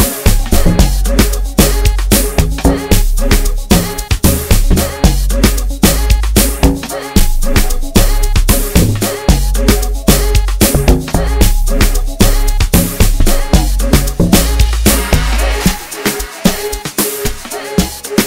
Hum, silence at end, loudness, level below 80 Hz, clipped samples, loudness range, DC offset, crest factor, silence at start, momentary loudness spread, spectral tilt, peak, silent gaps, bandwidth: none; 0 s; -13 LUFS; -12 dBFS; 0.3%; 1 LU; under 0.1%; 10 dB; 0 s; 5 LU; -4.5 dB/octave; 0 dBFS; none; 16.5 kHz